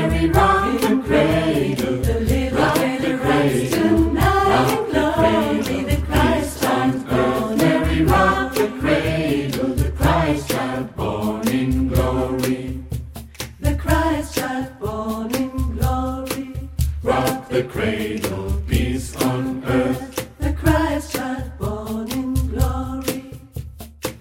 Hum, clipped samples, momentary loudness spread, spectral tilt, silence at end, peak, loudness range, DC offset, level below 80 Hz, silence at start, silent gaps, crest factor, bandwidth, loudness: none; under 0.1%; 10 LU; -6 dB/octave; 0 s; -2 dBFS; 5 LU; under 0.1%; -28 dBFS; 0 s; none; 18 dB; 17 kHz; -20 LUFS